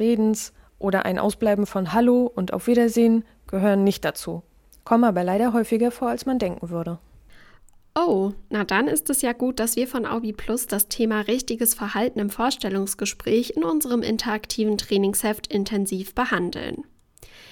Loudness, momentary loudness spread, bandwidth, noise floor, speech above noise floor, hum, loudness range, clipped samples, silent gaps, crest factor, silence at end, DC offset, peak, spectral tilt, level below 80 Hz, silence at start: -23 LUFS; 9 LU; 19 kHz; -51 dBFS; 29 dB; none; 4 LU; under 0.1%; none; 18 dB; 0.05 s; under 0.1%; -6 dBFS; -4.5 dB/octave; -50 dBFS; 0 s